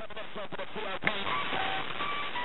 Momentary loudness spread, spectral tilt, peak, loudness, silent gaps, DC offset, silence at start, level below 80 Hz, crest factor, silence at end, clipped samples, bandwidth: 9 LU; -6 dB/octave; -10 dBFS; -33 LUFS; none; 2%; 0 s; -62 dBFS; 24 dB; 0 s; under 0.1%; 8.4 kHz